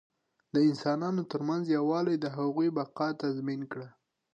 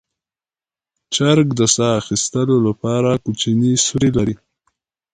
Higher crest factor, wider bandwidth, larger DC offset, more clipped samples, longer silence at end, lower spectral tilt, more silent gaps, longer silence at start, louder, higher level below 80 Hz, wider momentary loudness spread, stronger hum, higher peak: about the same, 14 dB vs 18 dB; second, 8 kHz vs 9.6 kHz; neither; neither; second, 0.45 s vs 0.8 s; first, -7.5 dB/octave vs -4.5 dB/octave; neither; second, 0.55 s vs 1.1 s; second, -31 LUFS vs -16 LUFS; second, -80 dBFS vs -46 dBFS; first, 9 LU vs 6 LU; neither; second, -16 dBFS vs 0 dBFS